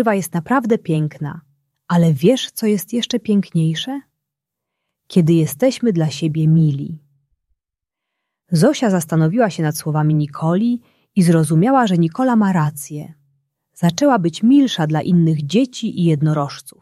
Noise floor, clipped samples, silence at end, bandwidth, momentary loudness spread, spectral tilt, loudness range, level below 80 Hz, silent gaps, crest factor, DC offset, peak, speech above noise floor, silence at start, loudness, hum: -83 dBFS; under 0.1%; 0.1 s; 14.5 kHz; 9 LU; -6.5 dB/octave; 3 LU; -60 dBFS; none; 14 dB; under 0.1%; -2 dBFS; 67 dB; 0 s; -17 LUFS; none